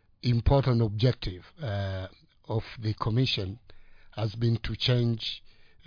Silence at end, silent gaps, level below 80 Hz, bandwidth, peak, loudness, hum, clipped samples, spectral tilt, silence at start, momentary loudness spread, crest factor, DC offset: 0.4 s; none; -42 dBFS; 5.2 kHz; -12 dBFS; -29 LUFS; none; under 0.1%; -7.5 dB/octave; 0.25 s; 14 LU; 18 dB; under 0.1%